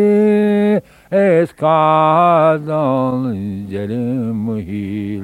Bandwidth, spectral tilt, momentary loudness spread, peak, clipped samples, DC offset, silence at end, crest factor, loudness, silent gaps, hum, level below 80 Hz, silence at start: 11.5 kHz; -8.5 dB/octave; 11 LU; -2 dBFS; under 0.1%; under 0.1%; 0 s; 12 dB; -15 LUFS; none; none; -54 dBFS; 0 s